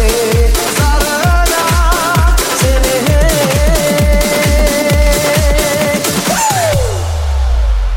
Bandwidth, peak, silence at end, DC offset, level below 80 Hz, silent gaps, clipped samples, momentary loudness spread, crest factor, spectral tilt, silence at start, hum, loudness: 17 kHz; 0 dBFS; 0 s; under 0.1%; -14 dBFS; none; under 0.1%; 3 LU; 10 dB; -4 dB/octave; 0 s; none; -12 LUFS